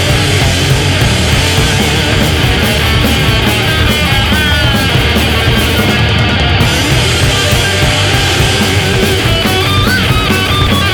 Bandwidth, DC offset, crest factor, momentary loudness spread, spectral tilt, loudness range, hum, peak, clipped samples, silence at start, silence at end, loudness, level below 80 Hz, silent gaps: over 20 kHz; under 0.1%; 10 dB; 1 LU; -4 dB/octave; 0 LU; none; 0 dBFS; under 0.1%; 0 s; 0 s; -9 LUFS; -20 dBFS; none